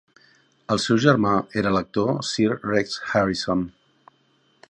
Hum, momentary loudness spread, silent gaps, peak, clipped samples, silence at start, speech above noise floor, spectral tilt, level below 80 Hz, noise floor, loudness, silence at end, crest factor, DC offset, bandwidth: none; 7 LU; none; -2 dBFS; under 0.1%; 0.7 s; 42 dB; -5.5 dB/octave; -54 dBFS; -63 dBFS; -22 LUFS; 1 s; 22 dB; under 0.1%; 10.5 kHz